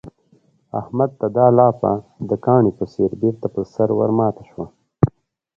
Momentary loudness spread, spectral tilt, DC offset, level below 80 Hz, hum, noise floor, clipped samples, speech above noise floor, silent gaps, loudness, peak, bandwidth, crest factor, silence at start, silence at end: 15 LU; -11.5 dB/octave; under 0.1%; -48 dBFS; none; -58 dBFS; under 0.1%; 40 dB; none; -19 LUFS; 0 dBFS; 7 kHz; 18 dB; 0.05 s; 0.5 s